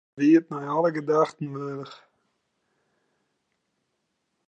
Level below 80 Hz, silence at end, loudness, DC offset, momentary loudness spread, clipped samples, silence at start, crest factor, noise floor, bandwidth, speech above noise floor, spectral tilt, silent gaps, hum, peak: -84 dBFS; 2.55 s; -24 LUFS; under 0.1%; 16 LU; under 0.1%; 0.15 s; 20 dB; -77 dBFS; 8.2 kHz; 53 dB; -7.5 dB/octave; none; none; -8 dBFS